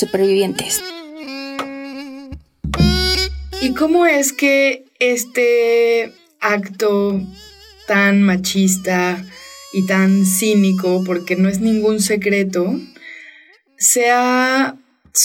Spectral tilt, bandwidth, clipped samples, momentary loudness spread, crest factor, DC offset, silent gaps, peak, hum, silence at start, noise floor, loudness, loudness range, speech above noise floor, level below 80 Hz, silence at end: -4 dB/octave; 16.5 kHz; under 0.1%; 17 LU; 14 dB; under 0.1%; none; -2 dBFS; none; 0 s; -47 dBFS; -16 LUFS; 3 LU; 32 dB; -36 dBFS; 0 s